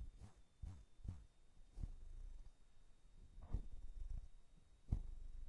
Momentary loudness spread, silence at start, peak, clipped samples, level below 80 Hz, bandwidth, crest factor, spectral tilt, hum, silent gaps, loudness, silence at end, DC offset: 17 LU; 0 s; -26 dBFS; under 0.1%; -52 dBFS; 11 kHz; 26 dB; -7.5 dB/octave; none; none; -56 LUFS; 0 s; under 0.1%